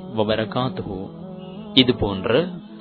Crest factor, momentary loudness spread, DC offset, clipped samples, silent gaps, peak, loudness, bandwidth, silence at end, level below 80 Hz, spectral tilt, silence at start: 22 dB; 18 LU; under 0.1%; under 0.1%; none; 0 dBFS; -21 LUFS; 5.4 kHz; 0 s; -44 dBFS; -8 dB/octave; 0 s